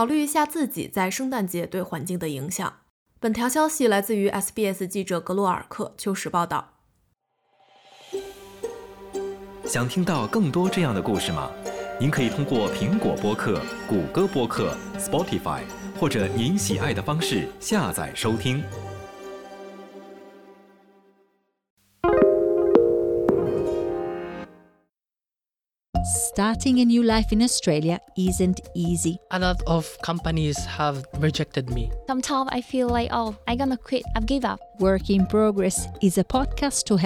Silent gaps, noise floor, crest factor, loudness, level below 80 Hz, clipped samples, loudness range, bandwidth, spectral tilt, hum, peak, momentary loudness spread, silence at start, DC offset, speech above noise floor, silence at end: 2.90-3.06 s, 21.70-21.77 s, 25.89-25.93 s; under -90 dBFS; 22 dB; -24 LUFS; -40 dBFS; under 0.1%; 7 LU; over 20 kHz; -5 dB/octave; none; -2 dBFS; 13 LU; 0 s; under 0.1%; over 66 dB; 0 s